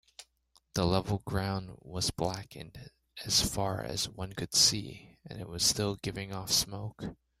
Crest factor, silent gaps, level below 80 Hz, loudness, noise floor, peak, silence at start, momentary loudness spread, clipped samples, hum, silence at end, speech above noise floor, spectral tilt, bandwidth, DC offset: 24 dB; none; -54 dBFS; -30 LUFS; -70 dBFS; -10 dBFS; 0.2 s; 20 LU; under 0.1%; none; 0.25 s; 37 dB; -3 dB/octave; 16 kHz; under 0.1%